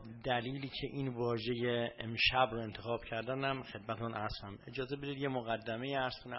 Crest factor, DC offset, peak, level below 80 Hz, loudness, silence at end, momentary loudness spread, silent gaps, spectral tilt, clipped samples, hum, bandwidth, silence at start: 22 dB; under 0.1%; -16 dBFS; -60 dBFS; -37 LUFS; 0 s; 10 LU; none; -3 dB/octave; under 0.1%; none; 5.8 kHz; 0 s